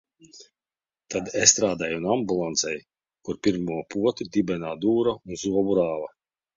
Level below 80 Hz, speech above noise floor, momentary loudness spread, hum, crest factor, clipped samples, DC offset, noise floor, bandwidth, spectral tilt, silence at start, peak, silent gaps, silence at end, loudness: -58 dBFS; over 65 dB; 14 LU; none; 24 dB; under 0.1%; under 0.1%; under -90 dBFS; 7.8 kHz; -3 dB/octave; 0.35 s; -2 dBFS; none; 0.5 s; -24 LUFS